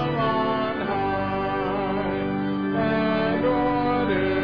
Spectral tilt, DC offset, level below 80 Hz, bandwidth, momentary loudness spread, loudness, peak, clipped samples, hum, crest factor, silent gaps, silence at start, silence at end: -9 dB/octave; 0.3%; -46 dBFS; 5.2 kHz; 3 LU; -24 LUFS; -14 dBFS; under 0.1%; none; 10 dB; none; 0 s; 0 s